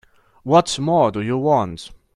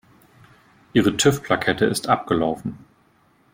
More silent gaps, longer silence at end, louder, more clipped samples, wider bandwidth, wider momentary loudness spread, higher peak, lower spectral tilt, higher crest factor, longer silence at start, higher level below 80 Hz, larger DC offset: neither; second, 0.2 s vs 0.75 s; first, -18 LUFS vs -21 LUFS; neither; second, 12 kHz vs 16.5 kHz; first, 15 LU vs 7 LU; about the same, -2 dBFS vs -4 dBFS; about the same, -5.5 dB/octave vs -4.5 dB/octave; about the same, 18 dB vs 18 dB; second, 0.45 s vs 0.95 s; about the same, -52 dBFS vs -54 dBFS; neither